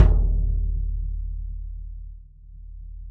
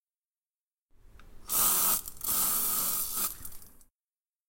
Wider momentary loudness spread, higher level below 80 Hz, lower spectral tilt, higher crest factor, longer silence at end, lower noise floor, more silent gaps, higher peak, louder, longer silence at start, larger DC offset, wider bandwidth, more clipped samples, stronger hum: first, 22 LU vs 10 LU; first, -24 dBFS vs -56 dBFS; first, -10 dB/octave vs 0 dB/octave; about the same, 20 dB vs 24 dB; second, 0 s vs 0.8 s; second, -43 dBFS vs under -90 dBFS; neither; first, -2 dBFS vs -10 dBFS; about the same, -28 LUFS vs -26 LUFS; second, 0 s vs 1.15 s; neither; second, 2.9 kHz vs 17 kHz; neither; neither